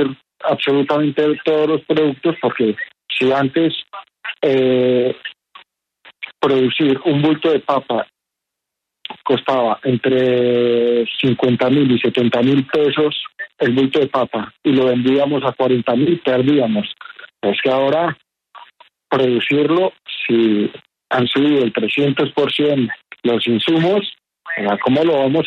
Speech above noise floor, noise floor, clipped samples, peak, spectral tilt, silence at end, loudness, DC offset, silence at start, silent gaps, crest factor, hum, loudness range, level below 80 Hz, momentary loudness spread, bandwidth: 65 dB; -81 dBFS; under 0.1%; -2 dBFS; -7.5 dB/octave; 0 s; -16 LUFS; under 0.1%; 0 s; none; 14 dB; none; 3 LU; -60 dBFS; 9 LU; 7.2 kHz